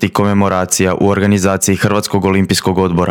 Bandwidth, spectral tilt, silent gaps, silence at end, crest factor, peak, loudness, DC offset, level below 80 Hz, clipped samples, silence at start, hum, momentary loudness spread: 17.5 kHz; -5 dB/octave; none; 0 s; 12 dB; 0 dBFS; -13 LUFS; under 0.1%; -46 dBFS; under 0.1%; 0 s; none; 2 LU